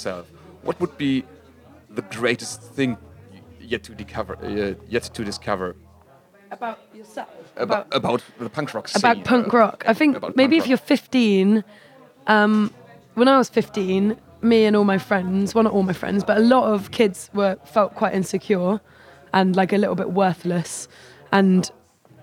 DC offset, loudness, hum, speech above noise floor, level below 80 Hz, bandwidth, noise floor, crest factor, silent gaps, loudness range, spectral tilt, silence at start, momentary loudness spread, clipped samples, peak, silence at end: under 0.1%; -21 LUFS; none; 32 dB; -60 dBFS; 16 kHz; -52 dBFS; 20 dB; none; 10 LU; -5.5 dB/octave; 0 s; 15 LU; under 0.1%; -2 dBFS; 0.55 s